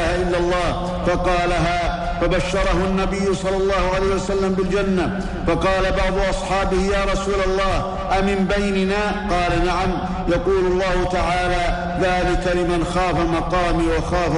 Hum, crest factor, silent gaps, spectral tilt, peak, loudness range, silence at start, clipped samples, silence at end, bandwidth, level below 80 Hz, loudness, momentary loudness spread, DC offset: none; 12 dB; none; -5.5 dB/octave; -8 dBFS; 0 LU; 0 s; under 0.1%; 0 s; 11 kHz; -28 dBFS; -20 LUFS; 3 LU; under 0.1%